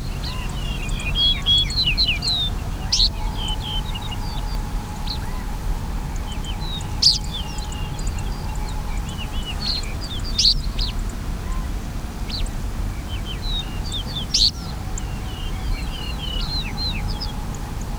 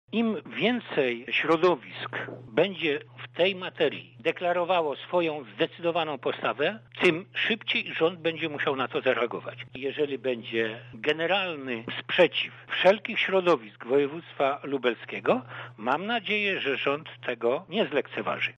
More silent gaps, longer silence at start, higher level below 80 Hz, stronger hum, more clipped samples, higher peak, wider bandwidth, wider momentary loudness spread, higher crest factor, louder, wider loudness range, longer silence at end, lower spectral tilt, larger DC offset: neither; about the same, 0 s vs 0.1 s; first, -26 dBFS vs -74 dBFS; neither; neither; first, -2 dBFS vs -8 dBFS; first, over 20 kHz vs 8.8 kHz; first, 13 LU vs 8 LU; about the same, 20 dB vs 20 dB; first, -23 LUFS vs -27 LUFS; first, 9 LU vs 3 LU; about the same, 0 s vs 0.05 s; second, -3 dB/octave vs -6 dB/octave; neither